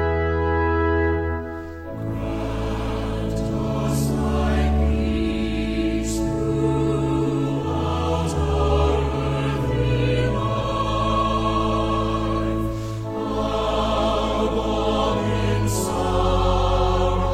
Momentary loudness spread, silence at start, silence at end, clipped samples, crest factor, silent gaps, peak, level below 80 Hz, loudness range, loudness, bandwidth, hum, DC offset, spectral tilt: 6 LU; 0 s; 0 s; under 0.1%; 14 dB; none; -8 dBFS; -28 dBFS; 3 LU; -22 LUFS; 15.5 kHz; none; under 0.1%; -6.5 dB/octave